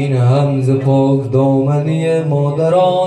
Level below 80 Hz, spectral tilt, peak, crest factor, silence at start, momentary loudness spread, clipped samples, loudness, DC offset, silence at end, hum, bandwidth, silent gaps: -52 dBFS; -8.5 dB/octave; -4 dBFS; 10 dB; 0 s; 3 LU; under 0.1%; -14 LUFS; under 0.1%; 0 s; none; 9.2 kHz; none